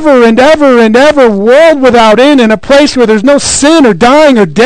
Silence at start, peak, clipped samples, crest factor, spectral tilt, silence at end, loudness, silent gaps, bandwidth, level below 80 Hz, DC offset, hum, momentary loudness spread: 0 s; 0 dBFS; 30%; 4 dB; -4 dB/octave; 0 s; -4 LUFS; none; 12 kHz; -34 dBFS; under 0.1%; none; 3 LU